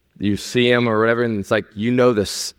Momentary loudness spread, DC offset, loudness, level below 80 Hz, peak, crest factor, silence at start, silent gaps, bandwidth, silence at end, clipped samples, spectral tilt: 6 LU; under 0.1%; -18 LUFS; -52 dBFS; -2 dBFS; 16 dB; 0.2 s; none; 16.5 kHz; 0.1 s; under 0.1%; -5 dB/octave